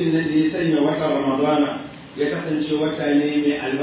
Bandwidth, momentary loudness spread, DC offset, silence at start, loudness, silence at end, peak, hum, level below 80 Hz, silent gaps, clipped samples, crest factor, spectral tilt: 4 kHz; 5 LU; under 0.1%; 0 s; -21 LUFS; 0 s; -8 dBFS; none; -56 dBFS; none; under 0.1%; 12 dB; -10.5 dB/octave